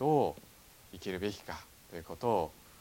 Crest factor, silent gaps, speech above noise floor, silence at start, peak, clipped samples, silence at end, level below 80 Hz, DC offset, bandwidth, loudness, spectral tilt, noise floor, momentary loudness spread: 20 dB; none; 21 dB; 0 s; -16 dBFS; under 0.1%; 0.25 s; -62 dBFS; under 0.1%; 17.5 kHz; -36 LUFS; -6 dB/octave; -58 dBFS; 21 LU